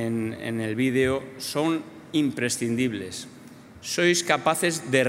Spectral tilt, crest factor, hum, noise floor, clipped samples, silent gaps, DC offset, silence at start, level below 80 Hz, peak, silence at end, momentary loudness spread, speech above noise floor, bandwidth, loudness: -4 dB/octave; 20 dB; none; -46 dBFS; under 0.1%; none; under 0.1%; 0 s; -62 dBFS; -6 dBFS; 0 s; 11 LU; 21 dB; 16 kHz; -25 LUFS